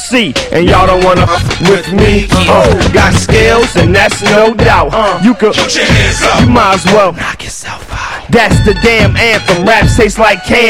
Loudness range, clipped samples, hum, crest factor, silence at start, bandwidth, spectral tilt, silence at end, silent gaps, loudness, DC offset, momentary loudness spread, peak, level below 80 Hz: 2 LU; 2%; none; 8 dB; 0 s; 16.5 kHz; -5 dB/octave; 0 s; none; -7 LUFS; under 0.1%; 5 LU; 0 dBFS; -20 dBFS